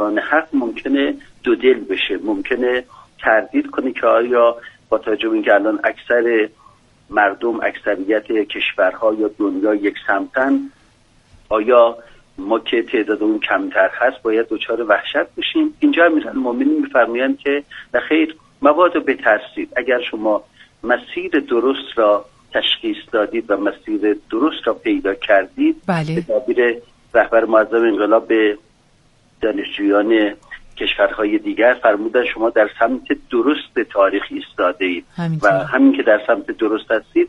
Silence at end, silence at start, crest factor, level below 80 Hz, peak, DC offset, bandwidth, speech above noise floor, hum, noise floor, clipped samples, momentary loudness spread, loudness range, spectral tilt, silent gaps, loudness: 0 s; 0 s; 18 dB; -52 dBFS; 0 dBFS; under 0.1%; 7.4 kHz; 37 dB; none; -54 dBFS; under 0.1%; 8 LU; 2 LU; -6.5 dB/octave; none; -17 LUFS